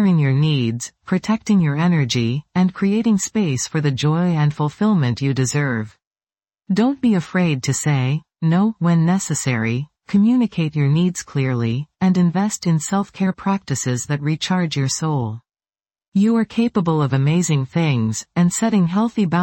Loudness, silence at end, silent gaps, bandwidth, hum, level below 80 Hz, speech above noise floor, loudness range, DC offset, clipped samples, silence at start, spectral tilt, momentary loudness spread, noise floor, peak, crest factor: -19 LUFS; 0 s; 6.07-6.11 s, 16.08-16.12 s; 17 kHz; none; -56 dBFS; over 72 dB; 2 LU; under 0.1%; under 0.1%; 0 s; -6 dB/octave; 5 LU; under -90 dBFS; -6 dBFS; 12 dB